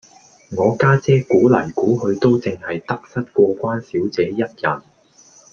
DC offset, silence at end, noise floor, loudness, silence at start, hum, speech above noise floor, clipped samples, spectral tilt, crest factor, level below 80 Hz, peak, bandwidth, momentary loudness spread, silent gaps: under 0.1%; 0.75 s; -50 dBFS; -18 LUFS; 0.5 s; none; 33 dB; under 0.1%; -7.5 dB/octave; 16 dB; -56 dBFS; -2 dBFS; 7 kHz; 11 LU; none